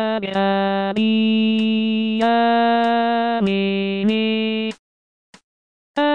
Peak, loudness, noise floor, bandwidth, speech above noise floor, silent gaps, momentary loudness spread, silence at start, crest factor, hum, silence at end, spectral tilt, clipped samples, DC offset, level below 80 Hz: -8 dBFS; -19 LUFS; under -90 dBFS; 7 kHz; over 72 dB; 4.79-5.33 s, 5.44-5.95 s; 5 LU; 0 s; 12 dB; none; 0 s; -7 dB/octave; under 0.1%; 0.3%; -66 dBFS